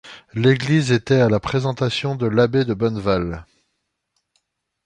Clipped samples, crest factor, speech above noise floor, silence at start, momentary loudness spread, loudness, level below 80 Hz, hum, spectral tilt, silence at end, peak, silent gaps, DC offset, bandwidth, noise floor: under 0.1%; 18 dB; 56 dB; 0.05 s; 6 LU; -19 LUFS; -46 dBFS; none; -6.5 dB/octave; 1.4 s; -4 dBFS; none; under 0.1%; 10 kHz; -75 dBFS